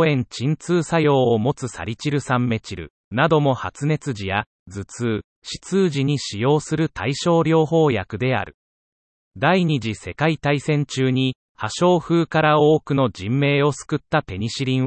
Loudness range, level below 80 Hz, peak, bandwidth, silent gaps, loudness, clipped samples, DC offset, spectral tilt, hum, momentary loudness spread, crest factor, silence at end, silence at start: 4 LU; -54 dBFS; -4 dBFS; 8.8 kHz; 2.90-3.11 s, 4.46-4.66 s, 5.24-5.42 s, 8.54-9.31 s, 11.35-11.55 s; -20 LUFS; under 0.1%; under 0.1%; -6 dB/octave; none; 11 LU; 16 dB; 0 s; 0 s